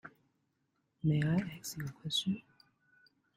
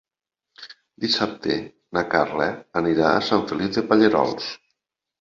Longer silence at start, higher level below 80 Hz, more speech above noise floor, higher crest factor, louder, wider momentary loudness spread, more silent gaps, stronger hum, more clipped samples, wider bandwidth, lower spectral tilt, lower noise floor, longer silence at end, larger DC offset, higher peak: second, 0.05 s vs 0.6 s; second, -68 dBFS vs -56 dBFS; second, 46 dB vs 65 dB; about the same, 18 dB vs 20 dB; second, -35 LUFS vs -22 LUFS; second, 11 LU vs 14 LU; neither; neither; neither; first, 15.5 kHz vs 7.4 kHz; about the same, -5 dB/octave vs -5.5 dB/octave; second, -80 dBFS vs -86 dBFS; first, 0.95 s vs 0.65 s; neither; second, -20 dBFS vs -2 dBFS